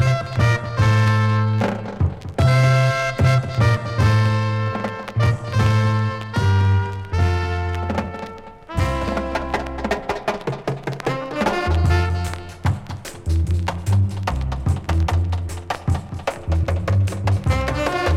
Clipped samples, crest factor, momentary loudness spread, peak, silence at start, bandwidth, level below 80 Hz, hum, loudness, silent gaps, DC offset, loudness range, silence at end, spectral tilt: under 0.1%; 14 dB; 9 LU; -4 dBFS; 0 s; 13 kHz; -30 dBFS; none; -21 LUFS; none; under 0.1%; 6 LU; 0 s; -6.5 dB/octave